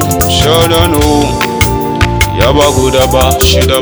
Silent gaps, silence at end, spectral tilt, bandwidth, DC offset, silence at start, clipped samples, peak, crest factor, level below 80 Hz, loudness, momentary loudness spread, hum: none; 0 s; -4.5 dB/octave; over 20 kHz; under 0.1%; 0 s; 2%; 0 dBFS; 8 dB; -18 dBFS; -9 LUFS; 4 LU; none